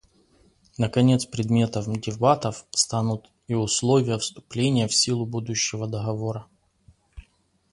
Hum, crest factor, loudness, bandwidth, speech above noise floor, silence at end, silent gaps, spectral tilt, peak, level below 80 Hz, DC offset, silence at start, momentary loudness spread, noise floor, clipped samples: none; 20 dB; -24 LUFS; 11.5 kHz; 40 dB; 0.5 s; none; -4.5 dB/octave; -4 dBFS; -54 dBFS; under 0.1%; 0.8 s; 9 LU; -64 dBFS; under 0.1%